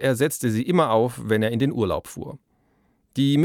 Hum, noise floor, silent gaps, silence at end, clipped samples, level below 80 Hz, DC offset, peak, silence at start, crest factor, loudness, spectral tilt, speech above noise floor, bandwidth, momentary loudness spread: none; -65 dBFS; none; 0 s; under 0.1%; -54 dBFS; under 0.1%; -6 dBFS; 0 s; 16 dB; -23 LUFS; -6 dB/octave; 43 dB; 17.5 kHz; 15 LU